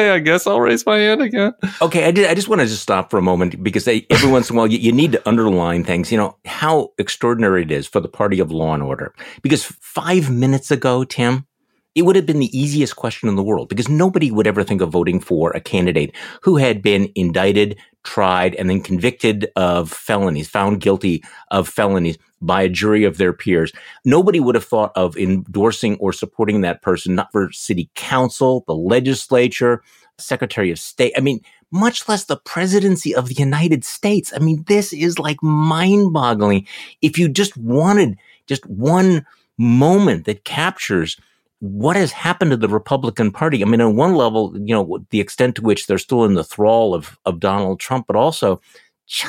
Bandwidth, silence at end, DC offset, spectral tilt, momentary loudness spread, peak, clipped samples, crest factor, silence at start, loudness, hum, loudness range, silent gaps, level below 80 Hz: 16.5 kHz; 0 s; under 0.1%; -5.5 dB/octave; 8 LU; 0 dBFS; under 0.1%; 16 dB; 0 s; -17 LUFS; none; 3 LU; none; -50 dBFS